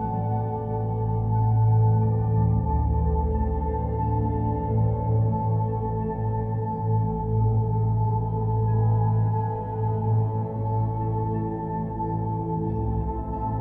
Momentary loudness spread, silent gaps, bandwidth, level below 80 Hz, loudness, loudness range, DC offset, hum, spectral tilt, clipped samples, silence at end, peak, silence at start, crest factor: 6 LU; none; 2.2 kHz; -34 dBFS; -25 LUFS; 3 LU; under 0.1%; none; -13.5 dB/octave; under 0.1%; 0 s; -12 dBFS; 0 s; 12 dB